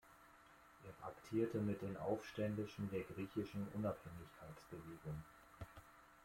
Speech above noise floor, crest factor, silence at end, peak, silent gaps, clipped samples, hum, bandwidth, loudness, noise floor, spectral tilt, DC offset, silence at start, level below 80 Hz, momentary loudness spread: 21 dB; 20 dB; 0 s; -28 dBFS; none; under 0.1%; none; 16.5 kHz; -46 LUFS; -66 dBFS; -7.5 dB/octave; under 0.1%; 0.05 s; -70 dBFS; 20 LU